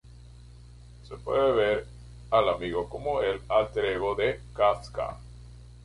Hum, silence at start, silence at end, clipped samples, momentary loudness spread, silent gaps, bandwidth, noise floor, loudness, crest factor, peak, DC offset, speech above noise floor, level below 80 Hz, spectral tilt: 60 Hz at -45 dBFS; 0.15 s; 0.1 s; under 0.1%; 21 LU; none; 11.5 kHz; -48 dBFS; -27 LUFS; 20 dB; -10 dBFS; under 0.1%; 22 dB; -48 dBFS; -6 dB/octave